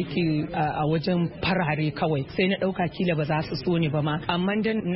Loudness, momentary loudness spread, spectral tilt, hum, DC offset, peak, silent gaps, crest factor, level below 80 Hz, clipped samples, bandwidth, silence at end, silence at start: -25 LUFS; 2 LU; -11 dB/octave; none; under 0.1%; -10 dBFS; none; 14 dB; -50 dBFS; under 0.1%; 5.8 kHz; 0 s; 0 s